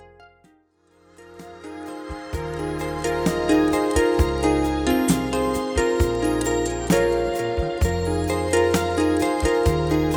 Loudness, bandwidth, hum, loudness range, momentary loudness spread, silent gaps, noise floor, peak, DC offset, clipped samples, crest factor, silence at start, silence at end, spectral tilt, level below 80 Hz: -22 LUFS; over 20 kHz; none; 5 LU; 12 LU; none; -59 dBFS; -6 dBFS; under 0.1%; under 0.1%; 16 dB; 0 s; 0 s; -5.5 dB/octave; -32 dBFS